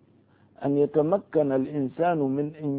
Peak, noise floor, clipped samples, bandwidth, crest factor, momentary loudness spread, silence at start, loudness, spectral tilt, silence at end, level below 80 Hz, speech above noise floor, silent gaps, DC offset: -10 dBFS; -59 dBFS; under 0.1%; 3.9 kHz; 16 dB; 6 LU; 0.6 s; -25 LUFS; -12.5 dB/octave; 0 s; -68 dBFS; 35 dB; none; under 0.1%